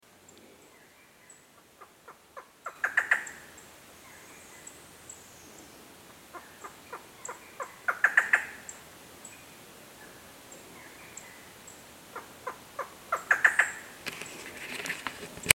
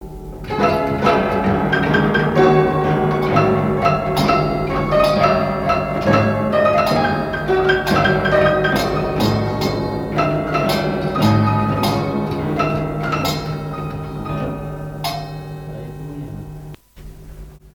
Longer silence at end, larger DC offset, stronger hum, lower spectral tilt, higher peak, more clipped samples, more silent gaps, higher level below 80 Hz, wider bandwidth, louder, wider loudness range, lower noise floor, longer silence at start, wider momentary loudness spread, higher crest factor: about the same, 0 s vs 0.05 s; neither; neither; second, -0.5 dB/octave vs -6.5 dB/octave; about the same, 0 dBFS vs 0 dBFS; neither; neither; second, -70 dBFS vs -36 dBFS; second, 17 kHz vs 19 kHz; second, -30 LUFS vs -17 LUFS; first, 17 LU vs 10 LU; first, -57 dBFS vs -38 dBFS; first, 1.3 s vs 0 s; first, 26 LU vs 13 LU; first, 36 dB vs 18 dB